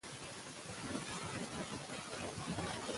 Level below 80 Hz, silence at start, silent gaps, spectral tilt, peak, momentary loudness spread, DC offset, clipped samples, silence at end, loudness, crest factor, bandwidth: -64 dBFS; 0.05 s; none; -3.5 dB/octave; -26 dBFS; 6 LU; under 0.1%; under 0.1%; 0 s; -44 LUFS; 18 dB; 11.5 kHz